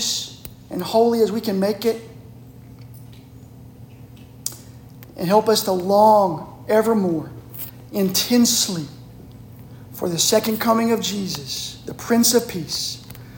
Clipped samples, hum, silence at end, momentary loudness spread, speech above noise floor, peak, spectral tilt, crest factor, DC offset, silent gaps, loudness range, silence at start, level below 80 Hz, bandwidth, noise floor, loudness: under 0.1%; none; 0 s; 19 LU; 23 dB; -2 dBFS; -3.5 dB/octave; 20 dB; under 0.1%; none; 9 LU; 0 s; -52 dBFS; 17 kHz; -42 dBFS; -19 LUFS